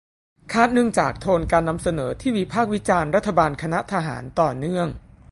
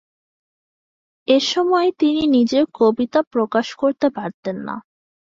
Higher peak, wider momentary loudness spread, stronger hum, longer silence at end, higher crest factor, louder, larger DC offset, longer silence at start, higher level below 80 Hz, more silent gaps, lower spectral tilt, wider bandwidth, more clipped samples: first, 0 dBFS vs -4 dBFS; second, 7 LU vs 12 LU; neither; second, 0.35 s vs 0.6 s; about the same, 20 dB vs 16 dB; second, -22 LUFS vs -18 LUFS; neither; second, 0.45 s vs 1.3 s; first, -42 dBFS vs -60 dBFS; second, none vs 3.27-3.31 s, 4.34-4.43 s; about the same, -6 dB/octave vs -5 dB/octave; first, 11.5 kHz vs 7.8 kHz; neither